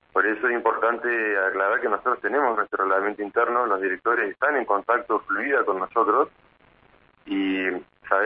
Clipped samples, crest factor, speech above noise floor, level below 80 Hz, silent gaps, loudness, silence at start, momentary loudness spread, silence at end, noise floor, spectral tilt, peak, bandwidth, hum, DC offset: under 0.1%; 20 dB; 34 dB; -66 dBFS; none; -23 LUFS; 0.15 s; 4 LU; 0 s; -58 dBFS; -8 dB/octave; -4 dBFS; 4.9 kHz; none; under 0.1%